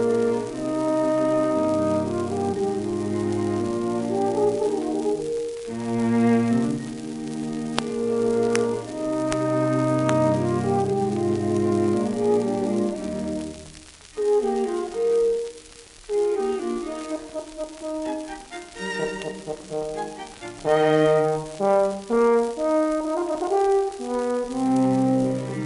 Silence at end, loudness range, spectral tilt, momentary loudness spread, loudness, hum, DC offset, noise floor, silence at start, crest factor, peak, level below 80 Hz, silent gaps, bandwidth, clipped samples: 0 s; 7 LU; -6.5 dB/octave; 12 LU; -24 LUFS; none; under 0.1%; -46 dBFS; 0 s; 22 dB; -2 dBFS; -54 dBFS; none; 11.5 kHz; under 0.1%